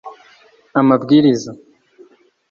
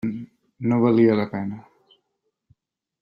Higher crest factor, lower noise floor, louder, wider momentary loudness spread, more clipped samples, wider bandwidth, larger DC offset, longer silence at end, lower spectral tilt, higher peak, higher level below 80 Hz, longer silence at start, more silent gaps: about the same, 16 dB vs 18 dB; second, -50 dBFS vs -77 dBFS; first, -14 LUFS vs -21 LUFS; second, 11 LU vs 18 LU; neither; first, 7.4 kHz vs 5.2 kHz; neither; second, 0.95 s vs 1.4 s; second, -6.5 dB/octave vs -10 dB/octave; first, -2 dBFS vs -6 dBFS; first, -58 dBFS vs -64 dBFS; about the same, 0.05 s vs 0.05 s; neither